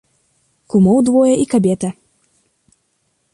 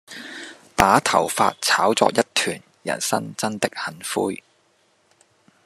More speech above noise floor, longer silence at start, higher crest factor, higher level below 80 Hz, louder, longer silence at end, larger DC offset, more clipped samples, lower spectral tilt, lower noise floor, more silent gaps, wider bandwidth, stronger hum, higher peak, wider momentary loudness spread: first, 53 dB vs 41 dB; first, 0.75 s vs 0.1 s; second, 14 dB vs 22 dB; about the same, -52 dBFS vs -50 dBFS; first, -14 LUFS vs -21 LUFS; about the same, 1.4 s vs 1.3 s; neither; neither; first, -7.5 dB/octave vs -3 dB/octave; about the same, -65 dBFS vs -62 dBFS; neither; second, 11.5 kHz vs 13.5 kHz; neither; second, -4 dBFS vs 0 dBFS; second, 9 LU vs 17 LU